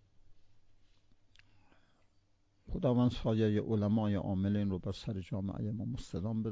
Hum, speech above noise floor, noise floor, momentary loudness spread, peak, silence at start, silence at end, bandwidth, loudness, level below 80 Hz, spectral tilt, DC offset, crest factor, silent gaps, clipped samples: none; 38 dB; -71 dBFS; 9 LU; -20 dBFS; 0.2 s; 0 s; 7.8 kHz; -34 LUFS; -52 dBFS; -8.5 dB/octave; under 0.1%; 16 dB; none; under 0.1%